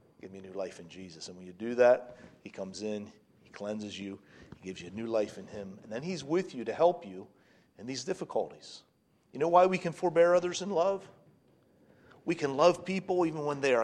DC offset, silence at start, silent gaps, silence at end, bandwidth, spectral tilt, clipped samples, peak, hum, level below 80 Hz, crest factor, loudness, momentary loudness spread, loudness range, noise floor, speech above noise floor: under 0.1%; 0.25 s; none; 0 s; 10 kHz; -5 dB/octave; under 0.1%; -10 dBFS; none; -74 dBFS; 22 dB; -31 LUFS; 23 LU; 9 LU; -65 dBFS; 34 dB